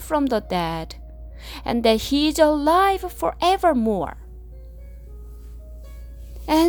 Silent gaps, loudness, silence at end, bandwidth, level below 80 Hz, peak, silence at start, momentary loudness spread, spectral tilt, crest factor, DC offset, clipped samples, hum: none; -21 LUFS; 0 s; over 20 kHz; -38 dBFS; -4 dBFS; 0 s; 24 LU; -5 dB/octave; 18 dB; under 0.1%; under 0.1%; none